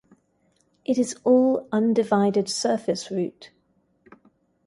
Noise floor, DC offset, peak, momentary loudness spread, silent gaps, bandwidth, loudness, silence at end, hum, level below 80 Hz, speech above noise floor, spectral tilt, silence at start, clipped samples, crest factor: -67 dBFS; under 0.1%; -6 dBFS; 10 LU; none; 11.5 kHz; -23 LUFS; 1.2 s; none; -70 dBFS; 45 dB; -5 dB/octave; 0.9 s; under 0.1%; 18 dB